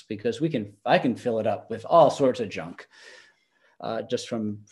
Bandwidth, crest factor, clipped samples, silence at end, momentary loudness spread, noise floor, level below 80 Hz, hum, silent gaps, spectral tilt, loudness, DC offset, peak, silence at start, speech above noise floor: 11.5 kHz; 20 dB; under 0.1%; 0.1 s; 15 LU; -65 dBFS; -70 dBFS; none; none; -6 dB/octave; -25 LUFS; under 0.1%; -6 dBFS; 0.1 s; 40 dB